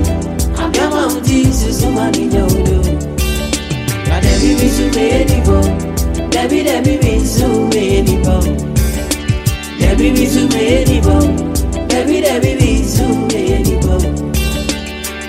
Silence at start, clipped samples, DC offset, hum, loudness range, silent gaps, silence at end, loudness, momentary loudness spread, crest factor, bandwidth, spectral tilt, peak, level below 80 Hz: 0 s; under 0.1%; under 0.1%; none; 1 LU; none; 0 s; -13 LUFS; 6 LU; 12 dB; 16.5 kHz; -5.5 dB/octave; 0 dBFS; -18 dBFS